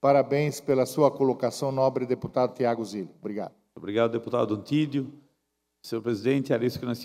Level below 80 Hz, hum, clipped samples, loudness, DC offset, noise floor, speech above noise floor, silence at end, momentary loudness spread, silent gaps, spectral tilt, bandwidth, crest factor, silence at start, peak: -66 dBFS; none; under 0.1%; -27 LUFS; under 0.1%; -78 dBFS; 52 dB; 0 s; 13 LU; none; -6.5 dB/octave; 16 kHz; 20 dB; 0.05 s; -8 dBFS